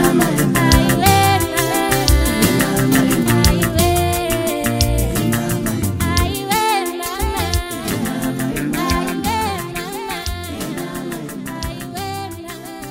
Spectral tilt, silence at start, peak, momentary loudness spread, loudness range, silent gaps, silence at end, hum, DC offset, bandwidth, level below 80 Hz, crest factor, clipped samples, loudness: -4.5 dB/octave; 0 s; 0 dBFS; 13 LU; 9 LU; none; 0 s; none; under 0.1%; 16.5 kHz; -26 dBFS; 18 dB; under 0.1%; -17 LUFS